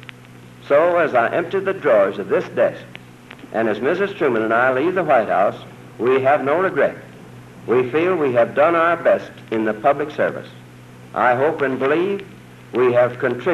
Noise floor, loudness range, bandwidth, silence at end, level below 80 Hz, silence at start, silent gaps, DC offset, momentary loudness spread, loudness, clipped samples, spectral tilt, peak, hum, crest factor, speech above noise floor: -42 dBFS; 2 LU; 13 kHz; 0 s; -62 dBFS; 0 s; none; under 0.1%; 11 LU; -18 LUFS; under 0.1%; -7 dB/octave; -4 dBFS; none; 14 dB; 24 dB